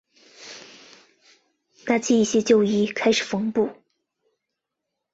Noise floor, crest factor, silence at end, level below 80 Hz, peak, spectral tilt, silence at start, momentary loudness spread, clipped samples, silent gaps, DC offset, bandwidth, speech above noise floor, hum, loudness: -82 dBFS; 18 dB; 1.4 s; -64 dBFS; -6 dBFS; -4.5 dB/octave; 0.4 s; 22 LU; under 0.1%; none; under 0.1%; 8 kHz; 62 dB; none; -21 LUFS